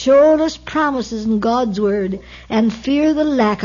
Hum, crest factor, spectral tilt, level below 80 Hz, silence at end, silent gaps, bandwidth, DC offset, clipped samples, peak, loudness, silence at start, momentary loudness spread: none; 12 dB; -6 dB/octave; -44 dBFS; 0 s; none; 7.4 kHz; under 0.1%; under 0.1%; -4 dBFS; -17 LUFS; 0 s; 9 LU